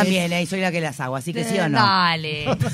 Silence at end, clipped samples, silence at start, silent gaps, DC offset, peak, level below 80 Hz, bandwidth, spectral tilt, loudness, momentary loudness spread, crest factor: 0 s; under 0.1%; 0 s; none; under 0.1%; -2 dBFS; -54 dBFS; 16 kHz; -5 dB/octave; -21 LUFS; 9 LU; 18 dB